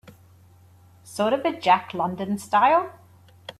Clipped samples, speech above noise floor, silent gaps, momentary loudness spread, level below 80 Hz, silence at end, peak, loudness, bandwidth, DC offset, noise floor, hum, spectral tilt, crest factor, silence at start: under 0.1%; 31 dB; none; 18 LU; -68 dBFS; 0.1 s; -6 dBFS; -22 LUFS; 14 kHz; under 0.1%; -53 dBFS; none; -5 dB/octave; 18 dB; 1.05 s